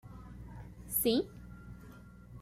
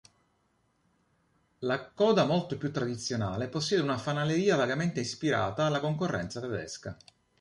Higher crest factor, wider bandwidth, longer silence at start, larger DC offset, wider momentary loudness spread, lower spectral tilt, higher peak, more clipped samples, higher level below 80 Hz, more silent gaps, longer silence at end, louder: about the same, 22 dB vs 18 dB; first, 16 kHz vs 11.5 kHz; second, 0.05 s vs 1.6 s; neither; first, 23 LU vs 10 LU; second, -4 dB/octave vs -5.5 dB/octave; second, -16 dBFS vs -12 dBFS; neither; first, -54 dBFS vs -60 dBFS; neither; second, 0 s vs 0.45 s; second, -33 LUFS vs -30 LUFS